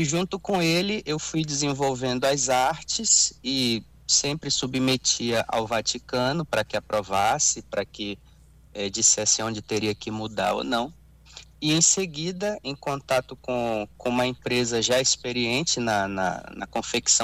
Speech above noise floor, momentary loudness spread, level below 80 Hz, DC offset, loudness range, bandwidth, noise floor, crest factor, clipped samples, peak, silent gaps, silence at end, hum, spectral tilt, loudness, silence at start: 25 dB; 11 LU; -54 dBFS; under 0.1%; 3 LU; 16 kHz; -50 dBFS; 20 dB; under 0.1%; -6 dBFS; none; 0 s; none; -2.5 dB/octave; -24 LUFS; 0 s